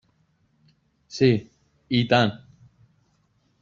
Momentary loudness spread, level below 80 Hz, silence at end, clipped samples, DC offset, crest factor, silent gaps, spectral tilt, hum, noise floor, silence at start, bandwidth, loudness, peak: 15 LU; -58 dBFS; 1.25 s; under 0.1%; under 0.1%; 22 dB; none; -6.5 dB/octave; none; -67 dBFS; 1.1 s; 7.6 kHz; -22 LUFS; -4 dBFS